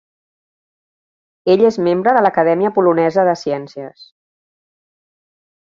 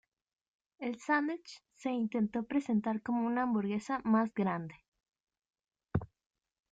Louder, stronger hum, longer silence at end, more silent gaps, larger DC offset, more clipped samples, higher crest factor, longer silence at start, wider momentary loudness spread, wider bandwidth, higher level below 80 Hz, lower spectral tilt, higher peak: first, -15 LUFS vs -34 LUFS; neither; first, 1.8 s vs 0.65 s; second, none vs 4.88-4.92 s; neither; neither; about the same, 16 dB vs 18 dB; first, 1.45 s vs 0.8 s; first, 13 LU vs 10 LU; about the same, 7.4 kHz vs 7.8 kHz; about the same, -62 dBFS vs -66 dBFS; about the same, -7 dB/octave vs -7 dB/octave; first, -2 dBFS vs -18 dBFS